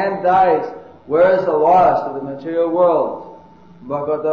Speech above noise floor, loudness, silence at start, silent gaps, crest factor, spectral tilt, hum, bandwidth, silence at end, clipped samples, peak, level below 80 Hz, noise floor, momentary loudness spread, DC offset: 27 dB; -16 LUFS; 0 s; none; 14 dB; -8 dB/octave; none; 6.4 kHz; 0 s; under 0.1%; -2 dBFS; -54 dBFS; -43 dBFS; 14 LU; 0.2%